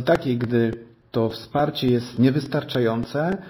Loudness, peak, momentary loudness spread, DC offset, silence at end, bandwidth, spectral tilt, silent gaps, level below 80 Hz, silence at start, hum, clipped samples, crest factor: -23 LUFS; -4 dBFS; 5 LU; under 0.1%; 0 s; 13.5 kHz; -7.5 dB/octave; none; -52 dBFS; 0 s; none; under 0.1%; 18 dB